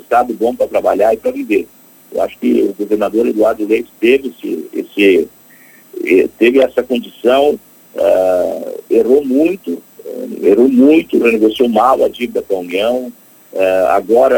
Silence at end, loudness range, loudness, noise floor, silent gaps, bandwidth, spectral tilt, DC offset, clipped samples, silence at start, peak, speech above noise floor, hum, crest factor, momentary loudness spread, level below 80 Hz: 0 s; 3 LU; -13 LUFS; -43 dBFS; none; 19 kHz; -5.5 dB/octave; under 0.1%; under 0.1%; 0.1 s; 0 dBFS; 30 dB; none; 12 dB; 13 LU; -50 dBFS